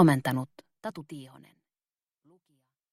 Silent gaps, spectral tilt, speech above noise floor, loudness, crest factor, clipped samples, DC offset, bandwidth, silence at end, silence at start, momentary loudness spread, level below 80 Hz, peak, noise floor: none; -7 dB/octave; over 63 dB; -31 LUFS; 22 dB; under 0.1%; under 0.1%; 15.5 kHz; 1.7 s; 0 s; 19 LU; -72 dBFS; -8 dBFS; under -90 dBFS